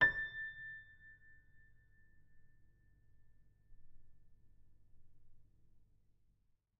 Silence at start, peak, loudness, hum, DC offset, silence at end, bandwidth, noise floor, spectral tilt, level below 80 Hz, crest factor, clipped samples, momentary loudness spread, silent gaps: 0 s; -18 dBFS; -40 LUFS; none; under 0.1%; 0.95 s; 5.6 kHz; -76 dBFS; -1 dB/octave; -66 dBFS; 28 dB; under 0.1%; 24 LU; none